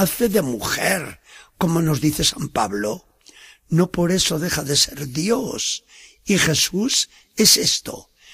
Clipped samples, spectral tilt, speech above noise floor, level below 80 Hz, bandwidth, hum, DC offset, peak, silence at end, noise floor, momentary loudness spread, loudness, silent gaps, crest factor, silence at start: under 0.1%; -3 dB/octave; 27 dB; -46 dBFS; 15.5 kHz; none; under 0.1%; -2 dBFS; 0 s; -48 dBFS; 10 LU; -19 LUFS; none; 18 dB; 0 s